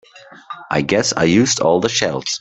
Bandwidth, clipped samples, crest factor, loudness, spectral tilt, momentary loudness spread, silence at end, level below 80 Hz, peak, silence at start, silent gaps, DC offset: 8.4 kHz; under 0.1%; 16 dB; -16 LUFS; -3.5 dB/octave; 10 LU; 0 s; -52 dBFS; 0 dBFS; 0.15 s; none; under 0.1%